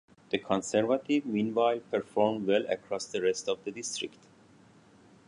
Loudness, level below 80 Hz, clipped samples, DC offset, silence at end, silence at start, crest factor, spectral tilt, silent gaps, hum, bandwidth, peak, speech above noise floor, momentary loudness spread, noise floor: -30 LUFS; -72 dBFS; under 0.1%; under 0.1%; 1.2 s; 0.3 s; 18 dB; -4 dB/octave; none; none; 11 kHz; -12 dBFS; 29 dB; 8 LU; -58 dBFS